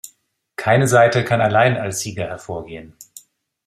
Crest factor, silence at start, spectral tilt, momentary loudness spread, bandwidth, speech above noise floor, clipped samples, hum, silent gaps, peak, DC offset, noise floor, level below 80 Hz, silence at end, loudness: 18 dB; 0.05 s; -5 dB/octave; 19 LU; 15.5 kHz; 43 dB; under 0.1%; none; none; -2 dBFS; under 0.1%; -60 dBFS; -54 dBFS; 0.65 s; -17 LUFS